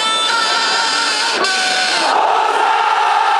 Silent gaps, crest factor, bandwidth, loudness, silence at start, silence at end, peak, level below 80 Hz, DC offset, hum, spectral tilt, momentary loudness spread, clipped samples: none; 12 dB; 13 kHz; -13 LUFS; 0 s; 0 s; -2 dBFS; -74 dBFS; under 0.1%; none; 1 dB/octave; 1 LU; under 0.1%